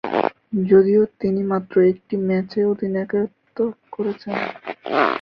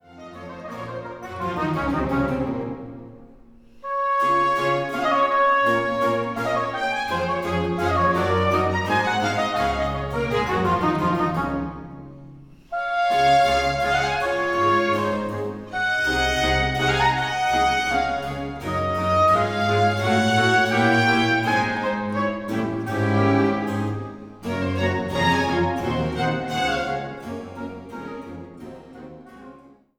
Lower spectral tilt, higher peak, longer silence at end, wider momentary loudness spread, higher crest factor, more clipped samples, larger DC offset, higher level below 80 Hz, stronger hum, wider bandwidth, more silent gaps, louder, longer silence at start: first, -9 dB/octave vs -5.5 dB/octave; first, -2 dBFS vs -6 dBFS; second, 0 s vs 0.4 s; second, 11 LU vs 17 LU; about the same, 18 dB vs 16 dB; neither; neither; second, -60 dBFS vs -42 dBFS; neither; second, 5.6 kHz vs 19 kHz; neither; about the same, -21 LUFS vs -22 LUFS; about the same, 0.05 s vs 0.1 s